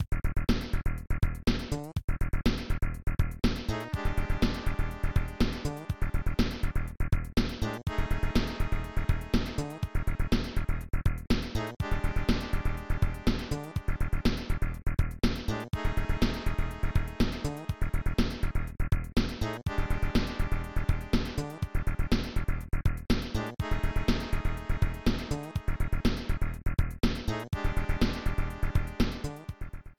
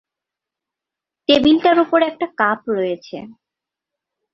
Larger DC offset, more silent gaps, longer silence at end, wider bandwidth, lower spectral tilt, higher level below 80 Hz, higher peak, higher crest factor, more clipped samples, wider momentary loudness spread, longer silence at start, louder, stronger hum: neither; first, 2.04-2.08 s vs none; second, 0.1 s vs 1 s; first, 16 kHz vs 7.4 kHz; about the same, -6.5 dB/octave vs -5.5 dB/octave; first, -32 dBFS vs -54 dBFS; second, -12 dBFS vs -2 dBFS; about the same, 16 dB vs 18 dB; neither; second, 5 LU vs 15 LU; second, 0 s vs 1.3 s; second, -33 LUFS vs -16 LUFS; neither